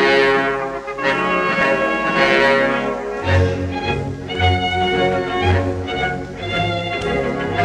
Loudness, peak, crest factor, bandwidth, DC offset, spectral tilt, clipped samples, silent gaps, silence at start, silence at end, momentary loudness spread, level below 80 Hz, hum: -18 LUFS; -2 dBFS; 16 dB; 10.5 kHz; under 0.1%; -6 dB/octave; under 0.1%; none; 0 s; 0 s; 9 LU; -40 dBFS; none